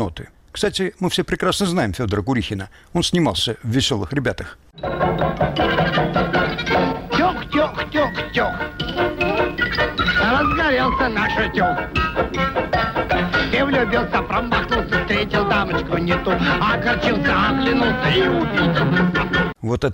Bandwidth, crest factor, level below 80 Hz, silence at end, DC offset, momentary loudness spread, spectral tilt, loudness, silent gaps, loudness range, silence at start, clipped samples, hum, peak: 16.5 kHz; 12 dB; -34 dBFS; 0 s; under 0.1%; 5 LU; -5.5 dB/octave; -19 LUFS; none; 3 LU; 0 s; under 0.1%; none; -8 dBFS